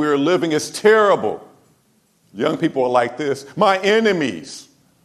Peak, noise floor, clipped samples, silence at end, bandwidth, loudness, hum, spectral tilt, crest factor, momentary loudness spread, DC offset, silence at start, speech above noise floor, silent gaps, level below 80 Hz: 0 dBFS; -60 dBFS; under 0.1%; 0.45 s; 13 kHz; -17 LUFS; none; -4.5 dB/octave; 18 dB; 13 LU; under 0.1%; 0 s; 43 dB; none; -66 dBFS